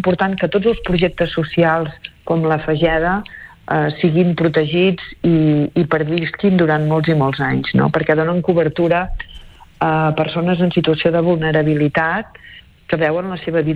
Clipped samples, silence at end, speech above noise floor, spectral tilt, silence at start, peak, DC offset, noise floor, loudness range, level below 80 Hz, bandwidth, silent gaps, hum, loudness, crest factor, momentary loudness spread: under 0.1%; 0 s; 26 dB; -9 dB/octave; 0 s; -2 dBFS; under 0.1%; -42 dBFS; 2 LU; -38 dBFS; 5 kHz; none; none; -16 LUFS; 14 dB; 6 LU